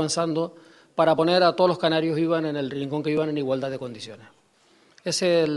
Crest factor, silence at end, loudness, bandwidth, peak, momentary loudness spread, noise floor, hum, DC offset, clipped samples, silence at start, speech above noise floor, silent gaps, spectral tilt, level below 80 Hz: 18 dB; 0 s; -23 LUFS; 12 kHz; -6 dBFS; 15 LU; -60 dBFS; none; under 0.1%; under 0.1%; 0 s; 37 dB; none; -5 dB/octave; -68 dBFS